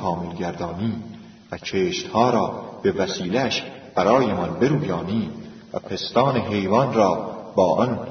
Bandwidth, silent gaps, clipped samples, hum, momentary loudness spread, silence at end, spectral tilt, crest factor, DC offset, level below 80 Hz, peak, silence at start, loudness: 6.6 kHz; none; under 0.1%; none; 13 LU; 0 s; -6 dB/octave; 18 dB; under 0.1%; -54 dBFS; -4 dBFS; 0 s; -22 LUFS